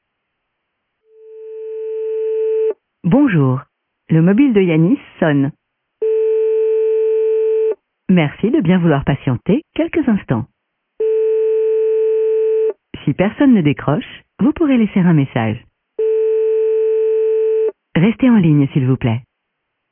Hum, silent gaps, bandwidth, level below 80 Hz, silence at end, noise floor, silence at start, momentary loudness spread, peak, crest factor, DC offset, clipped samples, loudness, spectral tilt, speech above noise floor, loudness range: none; none; 3.6 kHz; -48 dBFS; 0.7 s; -73 dBFS; 1.3 s; 10 LU; -2 dBFS; 14 dB; under 0.1%; under 0.1%; -16 LUFS; -12.5 dB/octave; 60 dB; 2 LU